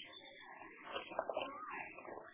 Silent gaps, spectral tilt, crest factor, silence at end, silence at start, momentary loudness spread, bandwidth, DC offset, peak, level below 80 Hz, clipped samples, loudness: none; -0.5 dB/octave; 26 dB; 0 s; 0 s; 11 LU; 3.9 kHz; under 0.1%; -22 dBFS; -82 dBFS; under 0.1%; -47 LUFS